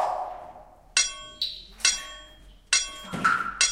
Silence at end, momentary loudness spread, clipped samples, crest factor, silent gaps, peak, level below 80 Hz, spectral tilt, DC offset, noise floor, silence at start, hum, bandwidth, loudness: 0 s; 17 LU; under 0.1%; 24 dB; none; -4 dBFS; -54 dBFS; 0.5 dB/octave; under 0.1%; -50 dBFS; 0 s; none; 16 kHz; -25 LUFS